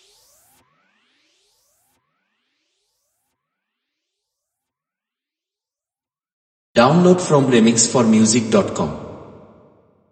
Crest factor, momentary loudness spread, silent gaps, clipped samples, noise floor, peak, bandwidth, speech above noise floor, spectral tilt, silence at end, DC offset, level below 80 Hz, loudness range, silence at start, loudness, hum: 20 dB; 12 LU; none; under 0.1%; under -90 dBFS; 0 dBFS; 8.8 kHz; over 76 dB; -5 dB/octave; 0.9 s; under 0.1%; -56 dBFS; 6 LU; 6.75 s; -15 LUFS; none